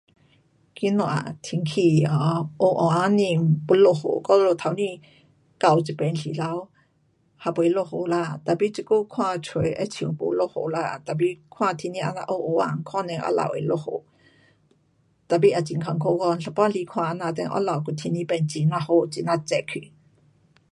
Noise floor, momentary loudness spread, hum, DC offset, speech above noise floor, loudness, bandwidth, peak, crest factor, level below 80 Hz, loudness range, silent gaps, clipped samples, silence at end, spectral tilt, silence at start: -65 dBFS; 9 LU; none; under 0.1%; 42 dB; -24 LUFS; 11.5 kHz; -4 dBFS; 20 dB; -62 dBFS; 5 LU; none; under 0.1%; 0.85 s; -7 dB/octave; 0.75 s